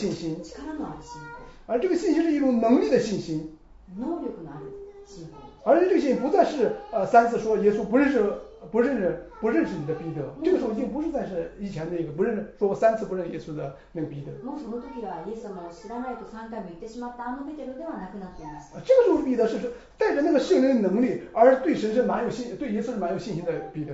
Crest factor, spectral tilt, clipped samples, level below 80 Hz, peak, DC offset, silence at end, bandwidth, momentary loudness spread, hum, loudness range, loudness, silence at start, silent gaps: 20 dB; -7 dB/octave; under 0.1%; -54 dBFS; -6 dBFS; under 0.1%; 0 s; 8 kHz; 18 LU; none; 13 LU; -25 LUFS; 0 s; none